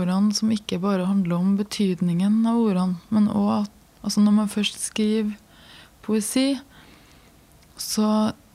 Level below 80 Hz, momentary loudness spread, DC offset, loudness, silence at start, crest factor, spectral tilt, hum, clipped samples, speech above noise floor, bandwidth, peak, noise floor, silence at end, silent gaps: -58 dBFS; 8 LU; under 0.1%; -23 LUFS; 0 s; 12 dB; -5.5 dB/octave; none; under 0.1%; 31 dB; 15 kHz; -10 dBFS; -53 dBFS; 0.2 s; none